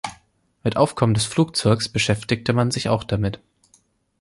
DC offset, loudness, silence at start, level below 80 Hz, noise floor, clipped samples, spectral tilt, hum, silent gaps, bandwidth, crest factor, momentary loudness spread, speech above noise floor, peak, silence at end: under 0.1%; -21 LUFS; 0.05 s; -46 dBFS; -61 dBFS; under 0.1%; -5 dB/octave; none; none; 11.5 kHz; 18 dB; 8 LU; 40 dB; -4 dBFS; 0.85 s